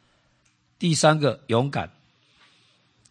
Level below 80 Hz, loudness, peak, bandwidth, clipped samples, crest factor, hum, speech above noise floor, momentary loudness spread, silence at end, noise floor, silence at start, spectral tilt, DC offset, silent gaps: -64 dBFS; -22 LUFS; -4 dBFS; 9.8 kHz; under 0.1%; 22 dB; 60 Hz at -45 dBFS; 44 dB; 12 LU; 1.25 s; -65 dBFS; 0.8 s; -5 dB/octave; under 0.1%; none